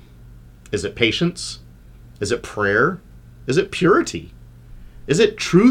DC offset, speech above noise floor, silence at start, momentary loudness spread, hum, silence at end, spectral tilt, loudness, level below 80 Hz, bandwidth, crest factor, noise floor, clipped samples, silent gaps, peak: under 0.1%; 25 dB; 0.25 s; 17 LU; 60 Hz at -50 dBFS; 0 s; -5 dB/octave; -19 LUFS; -44 dBFS; 15 kHz; 18 dB; -43 dBFS; under 0.1%; none; -2 dBFS